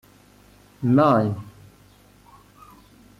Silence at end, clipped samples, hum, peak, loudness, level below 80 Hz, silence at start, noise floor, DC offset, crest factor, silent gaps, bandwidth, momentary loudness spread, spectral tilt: 1.7 s; under 0.1%; 50 Hz at -50 dBFS; -8 dBFS; -20 LUFS; -58 dBFS; 0.8 s; -53 dBFS; under 0.1%; 18 dB; none; 14.5 kHz; 19 LU; -9 dB/octave